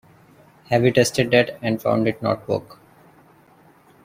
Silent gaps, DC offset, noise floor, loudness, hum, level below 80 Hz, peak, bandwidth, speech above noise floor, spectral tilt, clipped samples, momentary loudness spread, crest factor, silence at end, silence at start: none; under 0.1%; -53 dBFS; -20 LUFS; none; -56 dBFS; -2 dBFS; 16 kHz; 33 dB; -5 dB/octave; under 0.1%; 8 LU; 20 dB; 1.3 s; 0.7 s